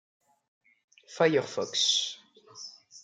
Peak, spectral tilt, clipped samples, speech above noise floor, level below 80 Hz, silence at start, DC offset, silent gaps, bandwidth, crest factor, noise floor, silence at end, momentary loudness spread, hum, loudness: -10 dBFS; -2.5 dB/octave; under 0.1%; 23 dB; -84 dBFS; 1.1 s; under 0.1%; none; 10.5 kHz; 22 dB; -50 dBFS; 0.05 s; 21 LU; none; -27 LUFS